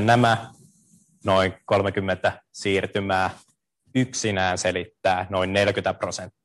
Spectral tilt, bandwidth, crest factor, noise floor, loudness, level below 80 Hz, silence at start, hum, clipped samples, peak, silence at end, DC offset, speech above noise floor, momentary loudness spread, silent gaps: -4.5 dB/octave; 12.5 kHz; 20 dB; -59 dBFS; -24 LUFS; -62 dBFS; 0 s; none; under 0.1%; -4 dBFS; 0.15 s; under 0.1%; 36 dB; 7 LU; none